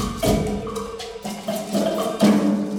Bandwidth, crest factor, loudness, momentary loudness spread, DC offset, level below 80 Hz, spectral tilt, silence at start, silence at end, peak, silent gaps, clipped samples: 17.5 kHz; 16 dB; -22 LUFS; 13 LU; under 0.1%; -38 dBFS; -5.5 dB/octave; 0 s; 0 s; -4 dBFS; none; under 0.1%